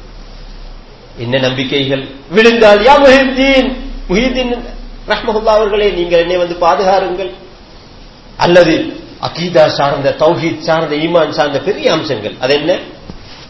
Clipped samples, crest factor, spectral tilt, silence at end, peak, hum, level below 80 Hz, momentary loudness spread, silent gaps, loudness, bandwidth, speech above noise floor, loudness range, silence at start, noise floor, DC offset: 0.9%; 12 dB; -5.5 dB/octave; 0 s; 0 dBFS; none; -32 dBFS; 15 LU; none; -11 LUFS; 8 kHz; 25 dB; 4 LU; 0 s; -35 dBFS; 0.3%